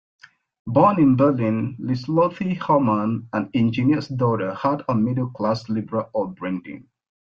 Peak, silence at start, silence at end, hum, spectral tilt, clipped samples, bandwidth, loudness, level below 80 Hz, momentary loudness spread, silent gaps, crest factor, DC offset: -4 dBFS; 0.65 s; 0.45 s; none; -9 dB/octave; under 0.1%; 7.2 kHz; -21 LUFS; -58 dBFS; 11 LU; none; 18 dB; under 0.1%